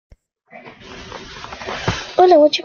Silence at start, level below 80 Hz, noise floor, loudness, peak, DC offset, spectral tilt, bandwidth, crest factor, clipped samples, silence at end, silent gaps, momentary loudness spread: 0.65 s; -44 dBFS; -44 dBFS; -15 LUFS; -2 dBFS; under 0.1%; -5 dB/octave; 7.2 kHz; 16 dB; under 0.1%; 0.05 s; none; 26 LU